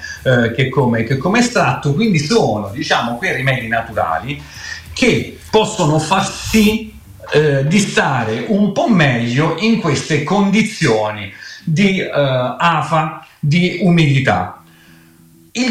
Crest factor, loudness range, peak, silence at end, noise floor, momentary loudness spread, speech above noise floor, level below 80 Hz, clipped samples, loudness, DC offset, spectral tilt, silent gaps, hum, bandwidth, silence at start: 12 dB; 2 LU; -2 dBFS; 0 s; -46 dBFS; 9 LU; 31 dB; -42 dBFS; under 0.1%; -15 LUFS; under 0.1%; -5.5 dB/octave; none; none; 16 kHz; 0 s